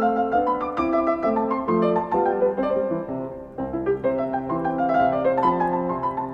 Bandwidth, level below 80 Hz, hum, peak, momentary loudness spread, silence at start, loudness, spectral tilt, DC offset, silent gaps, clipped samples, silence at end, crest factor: 6.4 kHz; -50 dBFS; none; -8 dBFS; 7 LU; 0 s; -23 LUFS; -9 dB/octave; under 0.1%; none; under 0.1%; 0 s; 14 dB